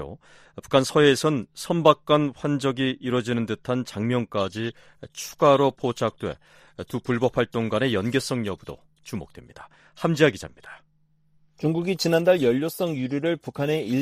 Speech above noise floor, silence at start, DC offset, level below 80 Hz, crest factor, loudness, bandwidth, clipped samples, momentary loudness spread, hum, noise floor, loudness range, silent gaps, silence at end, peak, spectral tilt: 39 dB; 0 s; under 0.1%; -58 dBFS; 24 dB; -24 LUFS; 15.5 kHz; under 0.1%; 17 LU; none; -63 dBFS; 5 LU; none; 0 s; 0 dBFS; -5.5 dB/octave